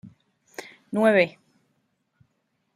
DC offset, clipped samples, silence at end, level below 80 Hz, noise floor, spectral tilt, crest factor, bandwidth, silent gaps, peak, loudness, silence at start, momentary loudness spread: under 0.1%; under 0.1%; 1.45 s; -76 dBFS; -73 dBFS; -6 dB/octave; 22 dB; 15 kHz; none; -6 dBFS; -22 LUFS; 0.05 s; 22 LU